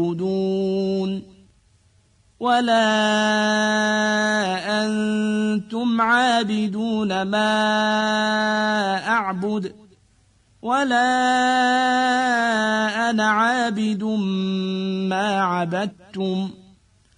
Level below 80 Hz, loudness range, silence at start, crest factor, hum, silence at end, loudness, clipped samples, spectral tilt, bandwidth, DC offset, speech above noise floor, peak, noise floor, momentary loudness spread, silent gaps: -62 dBFS; 3 LU; 0 s; 14 dB; none; 0.65 s; -20 LUFS; under 0.1%; -4.5 dB/octave; 10.5 kHz; under 0.1%; 38 dB; -6 dBFS; -58 dBFS; 7 LU; none